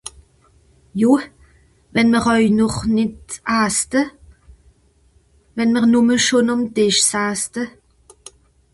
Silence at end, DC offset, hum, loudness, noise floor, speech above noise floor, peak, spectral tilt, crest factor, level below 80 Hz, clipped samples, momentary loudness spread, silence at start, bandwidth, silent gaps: 1.05 s; under 0.1%; none; -17 LUFS; -56 dBFS; 39 dB; -2 dBFS; -3.5 dB/octave; 16 dB; -48 dBFS; under 0.1%; 14 LU; 0.05 s; 12 kHz; none